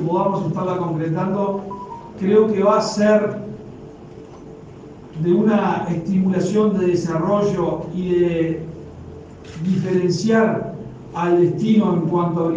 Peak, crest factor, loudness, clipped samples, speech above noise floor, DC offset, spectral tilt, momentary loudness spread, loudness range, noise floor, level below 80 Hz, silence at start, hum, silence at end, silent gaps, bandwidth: -4 dBFS; 16 dB; -19 LUFS; under 0.1%; 20 dB; under 0.1%; -7.5 dB/octave; 22 LU; 3 LU; -38 dBFS; -52 dBFS; 0 s; none; 0 s; none; 9.2 kHz